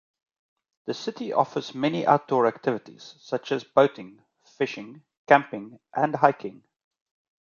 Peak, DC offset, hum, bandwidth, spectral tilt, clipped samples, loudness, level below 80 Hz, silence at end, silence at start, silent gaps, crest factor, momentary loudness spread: -2 dBFS; under 0.1%; none; 7.2 kHz; -6 dB/octave; under 0.1%; -25 LUFS; -74 dBFS; 0.95 s; 0.85 s; 5.17-5.25 s; 24 dB; 18 LU